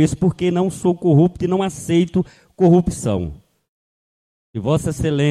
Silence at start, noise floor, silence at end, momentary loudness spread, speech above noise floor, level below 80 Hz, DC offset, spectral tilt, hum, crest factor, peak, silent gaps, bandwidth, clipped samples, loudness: 0 s; under -90 dBFS; 0 s; 10 LU; over 73 dB; -42 dBFS; under 0.1%; -7 dB/octave; none; 16 dB; -2 dBFS; 3.68-4.53 s; 13 kHz; under 0.1%; -18 LUFS